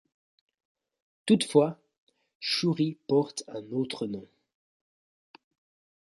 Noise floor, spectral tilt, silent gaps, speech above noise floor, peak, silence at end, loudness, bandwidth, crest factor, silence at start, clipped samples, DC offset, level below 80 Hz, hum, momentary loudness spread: under -90 dBFS; -5.5 dB/octave; 1.98-2.07 s, 2.35-2.40 s; over 63 dB; -8 dBFS; 1.75 s; -28 LUFS; 11.5 kHz; 22 dB; 1.25 s; under 0.1%; under 0.1%; -74 dBFS; none; 13 LU